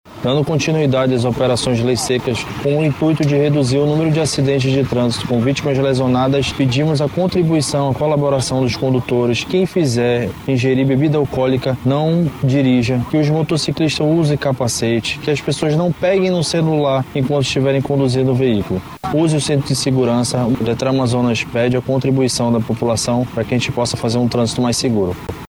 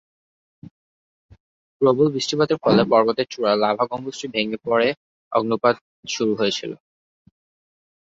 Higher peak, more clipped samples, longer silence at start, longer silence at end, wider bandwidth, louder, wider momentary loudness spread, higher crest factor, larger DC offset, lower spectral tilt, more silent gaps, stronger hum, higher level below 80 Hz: about the same, -4 dBFS vs -2 dBFS; neither; second, 0.05 s vs 1.8 s; second, 0.05 s vs 1.35 s; first, 16.5 kHz vs 7.8 kHz; first, -16 LUFS vs -21 LUFS; second, 3 LU vs 11 LU; second, 12 dB vs 20 dB; neither; about the same, -6 dB/octave vs -5 dB/octave; second, none vs 4.97-5.31 s, 5.81-6.03 s; neither; first, -42 dBFS vs -62 dBFS